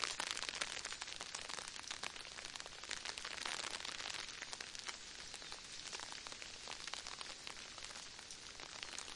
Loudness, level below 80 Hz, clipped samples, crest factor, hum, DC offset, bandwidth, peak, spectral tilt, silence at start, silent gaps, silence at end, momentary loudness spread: -46 LUFS; -70 dBFS; under 0.1%; 30 dB; none; under 0.1%; 11.5 kHz; -18 dBFS; 0.5 dB/octave; 0 s; none; 0 s; 7 LU